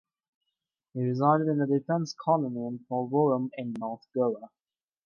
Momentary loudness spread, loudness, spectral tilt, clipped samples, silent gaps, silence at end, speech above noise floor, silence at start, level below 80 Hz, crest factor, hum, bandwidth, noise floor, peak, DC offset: 11 LU; -28 LUFS; -8 dB/octave; under 0.1%; none; 0.6 s; 58 dB; 0.95 s; -82 dBFS; 18 dB; none; 7 kHz; -85 dBFS; -10 dBFS; under 0.1%